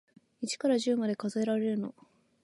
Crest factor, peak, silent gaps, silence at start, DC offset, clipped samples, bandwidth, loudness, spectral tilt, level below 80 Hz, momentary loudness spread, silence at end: 14 dB; -16 dBFS; none; 0.4 s; under 0.1%; under 0.1%; 11.5 kHz; -31 LUFS; -5 dB/octave; -80 dBFS; 10 LU; 0.55 s